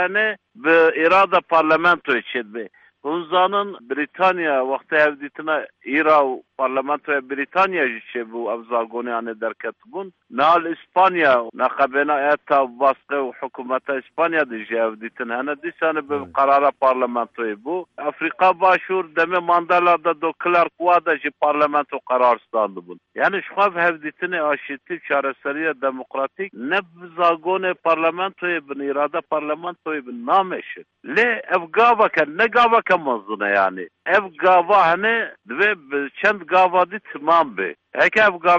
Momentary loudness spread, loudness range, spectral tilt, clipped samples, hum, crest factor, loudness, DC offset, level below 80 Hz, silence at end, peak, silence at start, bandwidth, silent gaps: 12 LU; 5 LU; -5.5 dB/octave; under 0.1%; none; 16 dB; -19 LUFS; under 0.1%; -66 dBFS; 0 s; -4 dBFS; 0 s; 7.8 kHz; none